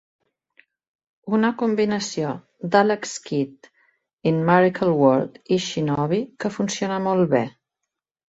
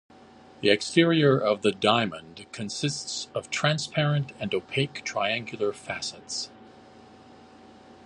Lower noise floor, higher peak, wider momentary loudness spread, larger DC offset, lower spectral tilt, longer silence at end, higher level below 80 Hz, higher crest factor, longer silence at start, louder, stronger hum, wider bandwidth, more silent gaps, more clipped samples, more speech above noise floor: first, -83 dBFS vs -51 dBFS; about the same, -4 dBFS vs -4 dBFS; about the same, 10 LU vs 12 LU; neither; about the same, -5.5 dB/octave vs -4.5 dB/octave; second, 0.8 s vs 1.25 s; about the same, -62 dBFS vs -64 dBFS; about the same, 20 dB vs 22 dB; first, 1.25 s vs 0.6 s; first, -22 LUFS vs -26 LUFS; neither; second, 8.2 kHz vs 11 kHz; first, 4.13-4.17 s vs none; neither; first, 62 dB vs 25 dB